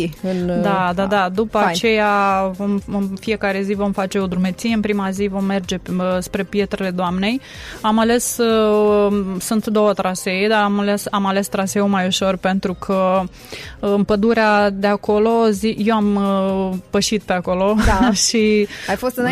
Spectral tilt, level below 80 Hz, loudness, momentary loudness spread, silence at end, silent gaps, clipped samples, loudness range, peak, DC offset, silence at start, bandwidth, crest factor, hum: -5 dB/octave; -38 dBFS; -18 LUFS; 7 LU; 0 s; none; under 0.1%; 4 LU; -6 dBFS; under 0.1%; 0 s; 15 kHz; 12 dB; none